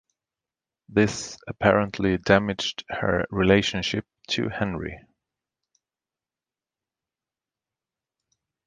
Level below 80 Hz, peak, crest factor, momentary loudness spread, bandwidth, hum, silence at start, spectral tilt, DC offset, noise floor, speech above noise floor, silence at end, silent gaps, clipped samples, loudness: -48 dBFS; -2 dBFS; 24 dB; 11 LU; 9.8 kHz; none; 0.9 s; -5 dB/octave; under 0.1%; under -90 dBFS; over 66 dB; 3.65 s; none; under 0.1%; -24 LUFS